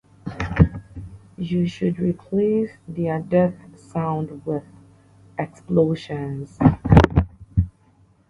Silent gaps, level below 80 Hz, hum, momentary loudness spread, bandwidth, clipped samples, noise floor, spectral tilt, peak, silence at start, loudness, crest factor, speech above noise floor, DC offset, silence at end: none; -32 dBFS; none; 15 LU; 10.5 kHz; under 0.1%; -56 dBFS; -9 dB/octave; 0 dBFS; 0.25 s; -22 LUFS; 22 dB; 35 dB; under 0.1%; 0.6 s